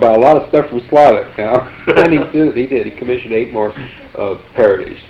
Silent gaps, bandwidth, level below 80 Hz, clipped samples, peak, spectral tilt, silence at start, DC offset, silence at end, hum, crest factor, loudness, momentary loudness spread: none; 8.4 kHz; -44 dBFS; under 0.1%; 0 dBFS; -7.5 dB/octave; 0 s; under 0.1%; 0.1 s; none; 12 dB; -13 LUFS; 12 LU